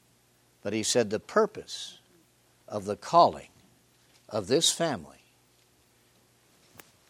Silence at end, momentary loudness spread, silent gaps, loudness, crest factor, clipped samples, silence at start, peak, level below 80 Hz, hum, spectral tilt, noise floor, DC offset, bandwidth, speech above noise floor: 2 s; 17 LU; none; -27 LUFS; 22 dB; under 0.1%; 0.65 s; -8 dBFS; -70 dBFS; none; -3 dB/octave; -65 dBFS; under 0.1%; 16 kHz; 38 dB